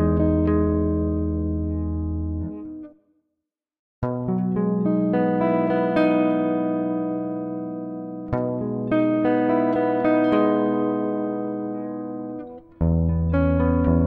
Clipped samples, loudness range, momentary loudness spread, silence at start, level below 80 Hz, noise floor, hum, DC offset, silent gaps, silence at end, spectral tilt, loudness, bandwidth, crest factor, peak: under 0.1%; 6 LU; 11 LU; 0 s; -36 dBFS; -82 dBFS; none; under 0.1%; 3.79-4.02 s; 0 s; -11 dB/octave; -23 LUFS; 4.5 kHz; 16 dB; -6 dBFS